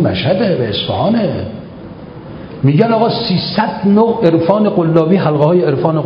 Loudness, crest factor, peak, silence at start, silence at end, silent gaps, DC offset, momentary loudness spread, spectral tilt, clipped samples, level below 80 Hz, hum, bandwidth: -13 LUFS; 12 dB; 0 dBFS; 0 s; 0 s; none; under 0.1%; 19 LU; -10 dB/octave; 0.1%; -42 dBFS; none; 5.4 kHz